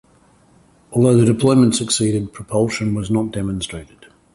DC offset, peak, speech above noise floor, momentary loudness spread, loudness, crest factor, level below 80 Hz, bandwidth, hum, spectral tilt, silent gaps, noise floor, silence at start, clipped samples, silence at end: under 0.1%; -2 dBFS; 36 dB; 11 LU; -17 LUFS; 16 dB; -44 dBFS; 11.5 kHz; none; -5.5 dB/octave; none; -53 dBFS; 0.9 s; under 0.1%; 0.5 s